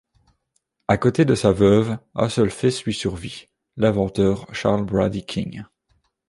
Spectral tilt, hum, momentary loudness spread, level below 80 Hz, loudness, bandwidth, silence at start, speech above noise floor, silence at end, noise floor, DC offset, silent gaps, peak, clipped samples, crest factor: -6.5 dB/octave; none; 16 LU; -44 dBFS; -20 LUFS; 11.5 kHz; 0.9 s; 52 dB; 0.65 s; -72 dBFS; under 0.1%; none; -2 dBFS; under 0.1%; 18 dB